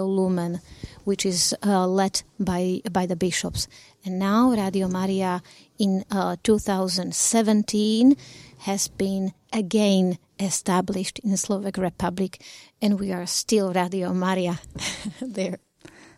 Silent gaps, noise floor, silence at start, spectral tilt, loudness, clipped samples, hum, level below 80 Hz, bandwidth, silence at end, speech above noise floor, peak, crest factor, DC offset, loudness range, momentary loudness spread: none; -49 dBFS; 0 s; -4.5 dB/octave; -24 LUFS; under 0.1%; none; -52 dBFS; 16 kHz; 0.6 s; 26 dB; -8 dBFS; 16 dB; under 0.1%; 3 LU; 11 LU